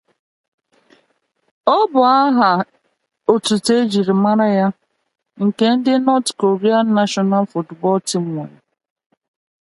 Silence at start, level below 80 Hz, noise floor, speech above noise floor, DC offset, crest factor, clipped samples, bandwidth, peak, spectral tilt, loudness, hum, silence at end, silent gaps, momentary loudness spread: 1.65 s; -66 dBFS; -65 dBFS; 50 dB; under 0.1%; 18 dB; under 0.1%; 11.5 kHz; 0 dBFS; -5.5 dB/octave; -16 LUFS; none; 1.15 s; none; 9 LU